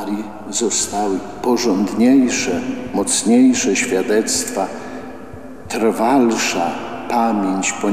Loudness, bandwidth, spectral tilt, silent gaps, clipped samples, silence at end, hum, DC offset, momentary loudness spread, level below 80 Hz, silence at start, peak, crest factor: -17 LUFS; 15.5 kHz; -3.5 dB/octave; none; under 0.1%; 0 s; none; 1%; 14 LU; -50 dBFS; 0 s; -4 dBFS; 14 dB